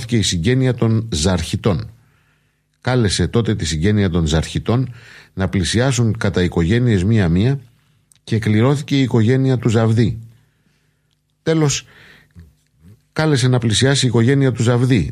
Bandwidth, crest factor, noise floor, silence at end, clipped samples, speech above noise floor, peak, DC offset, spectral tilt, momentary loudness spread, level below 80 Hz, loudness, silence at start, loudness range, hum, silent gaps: 12 kHz; 16 dB; -64 dBFS; 0 s; under 0.1%; 48 dB; -2 dBFS; under 0.1%; -5.5 dB/octave; 7 LU; -36 dBFS; -17 LUFS; 0 s; 4 LU; none; none